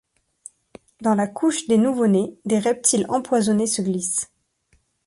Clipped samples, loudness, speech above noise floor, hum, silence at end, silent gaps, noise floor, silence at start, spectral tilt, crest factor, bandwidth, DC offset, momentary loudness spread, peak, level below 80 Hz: under 0.1%; -21 LUFS; 44 dB; none; 0.8 s; none; -64 dBFS; 1 s; -4.5 dB/octave; 18 dB; 11.5 kHz; under 0.1%; 5 LU; -4 dBFS; -62 dBFS